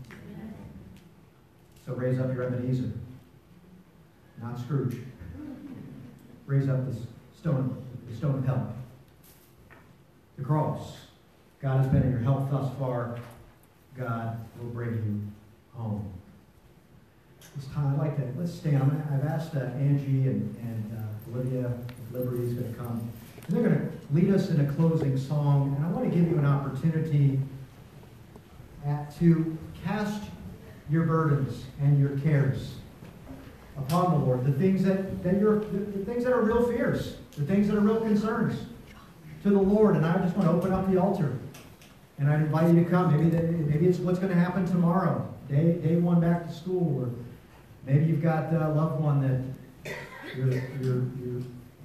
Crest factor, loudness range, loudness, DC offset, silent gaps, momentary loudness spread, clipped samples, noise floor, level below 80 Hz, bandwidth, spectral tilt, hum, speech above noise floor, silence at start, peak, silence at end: 18 dB; 9 LU; -27 LUFS; under 0.1%; none; 18 LU; under 0.1%; -58 dBFS; -54 dBFS; 14 kHz; -9 dB/octave; none; 32 dB; 0 s; -10 dBFS; 0 s